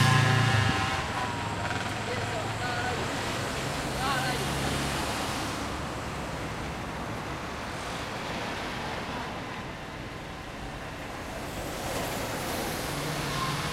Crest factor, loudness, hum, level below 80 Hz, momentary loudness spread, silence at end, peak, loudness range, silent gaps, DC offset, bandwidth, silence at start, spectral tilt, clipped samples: 20 dB; -31 LUFS; none; -46 dBFS; 10 LU; 0 s; -10 dBFS; 6 LU; none; under 0.1%; 16 kHz; 0 s; -4.5 dB/octave; under 0.1%